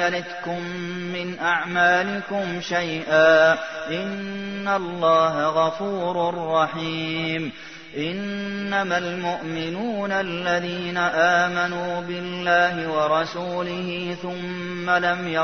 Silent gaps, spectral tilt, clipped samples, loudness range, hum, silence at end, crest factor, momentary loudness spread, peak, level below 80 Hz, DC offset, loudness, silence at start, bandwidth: none; -5 dB/octave; under 0.1%; 5 LU; none; 0 s; 18 dB; 11 LU; -6 dBFS; -62 dBFS; 0.3%; -23 LUFS; 0 s; 6.6 kHz